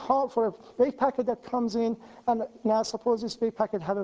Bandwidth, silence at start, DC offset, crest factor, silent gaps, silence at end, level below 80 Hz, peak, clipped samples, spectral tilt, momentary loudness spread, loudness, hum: 8 kHz; 0 s; under 0.1%; 16 dB; none; 0 s; -66 dBFS; -12 dBFS; under 0.1%; -5.5 dB/octave; 6 LU; -28 LUFS; none